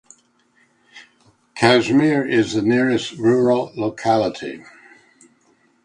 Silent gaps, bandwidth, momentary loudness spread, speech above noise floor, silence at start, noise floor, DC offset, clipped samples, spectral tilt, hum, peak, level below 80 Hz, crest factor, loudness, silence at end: none; 10.5 kHz; 14 LU; 42 dB; 0.95 s; -60 dBFS; under 0.1%; under 0.1%; -5.5 dB/octave; none; 0 dBFS; -58 dBFS; 20 dB; -18 LUFS; 1.25 s